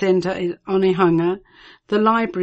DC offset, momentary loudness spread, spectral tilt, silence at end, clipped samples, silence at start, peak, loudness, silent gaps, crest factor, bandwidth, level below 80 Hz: under 0.1%; 8 LU; -7.5 dB/octave; 0 s; under 0.1%; 0 s; -4 dBFS; -19 LUFS; none; 14 dB; 8.2 kHz; -56 dBFS